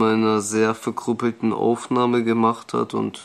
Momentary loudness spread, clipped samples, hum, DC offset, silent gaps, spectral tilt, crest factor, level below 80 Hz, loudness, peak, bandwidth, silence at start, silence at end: 6 LU; under 0.1%; none; under 0.1%; none; -5.5 dB/octave; 16 dB; -68 dBFS; -21 LUFS; -6 dBFS; 13 kHz; 0 s; 0 s